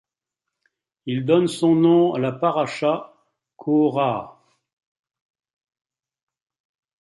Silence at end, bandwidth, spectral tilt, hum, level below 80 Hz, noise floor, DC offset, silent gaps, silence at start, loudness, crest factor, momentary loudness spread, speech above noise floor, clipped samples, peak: 2.7 s; 11.5 kHz; -7 dB/octave; none; -68 dBFS; -85 dBFS; under 0.1%; none; 1.05 s; -20 LUFS; 18 dB; 12 LU; 66 dB; under 0.1%; -6 dBFS